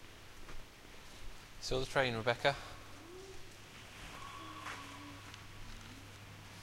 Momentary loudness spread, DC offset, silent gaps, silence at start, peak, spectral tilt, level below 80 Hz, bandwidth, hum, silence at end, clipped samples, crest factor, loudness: 20 LU; under 0.1%; none; 0 s; -16 dBFS; -4 dB/octave; -54 dBFS; 16 kHz; none; 0 s; under 0.1%; 26 dB; -40 LUFS